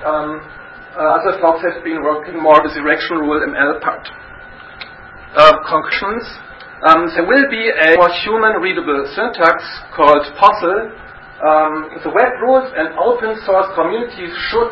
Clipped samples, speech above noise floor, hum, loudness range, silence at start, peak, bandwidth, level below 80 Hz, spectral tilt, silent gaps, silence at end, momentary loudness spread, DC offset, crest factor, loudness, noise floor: 0.2%; 22 dB; none; 3 LU; 0 s; 0 dBFS; 8 kHz; -46 dBFS; -5.5 dB/octave; none; 0 s; 19 LU; under 0.1%; 14 dB; -14 LUFS; -35 dBFS